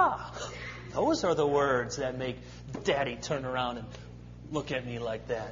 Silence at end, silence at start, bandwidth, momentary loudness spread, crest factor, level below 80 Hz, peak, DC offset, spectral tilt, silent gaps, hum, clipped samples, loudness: 0 s; 0 s; 7.6 kHz; 16 LU; 20 dB; -52 dBFS; -12 dBFS; under 0.1%; -5 dB/octave; none; 60 Hz at -45 dBFS; under 0.1%; -31 LUFS